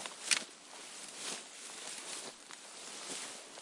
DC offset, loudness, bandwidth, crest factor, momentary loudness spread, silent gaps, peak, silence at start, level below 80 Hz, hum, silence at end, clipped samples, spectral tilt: under 0.1%; -40 LUFS; 11.5 kHz; 32 dB; 15 LU; none; -12 dBFS; 0 s; under -90 dBFS; none; 0 s; under 0.1%; 1 dB/octave